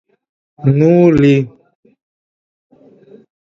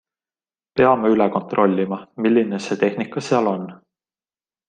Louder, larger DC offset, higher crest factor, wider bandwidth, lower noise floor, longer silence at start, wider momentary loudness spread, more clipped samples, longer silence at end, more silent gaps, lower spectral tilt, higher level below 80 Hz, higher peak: first, -11 LUFS vs -19 LUFS; neither; about the same, 16 dB vs 20 dB; second, 7.4 kHz vs 9.4 kHz; second, -43 dBFS vs under -90 dBFS; second, 0.6 s vs 0.75 s; about the same, 9 LU vs 10 LU; neither; first, 2.05 s vs 0.9 s; neither; first, -9 dB/octave vs -6.5 dB/octave; first, -46 dBFS vs -60 dBFS; about the same, 0 dBFS vs -2 dBFS